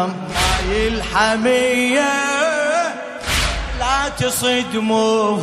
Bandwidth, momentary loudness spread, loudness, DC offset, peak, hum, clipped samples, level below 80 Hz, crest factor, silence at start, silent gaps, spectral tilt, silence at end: 15.5 kHz; 5 LU; -17 LUFS; under 0.1%; -4 dBFS; none; under 0.1%; -30 dBFS; 14 dB; 0 s; none; -3.5 dB/octave; 0 s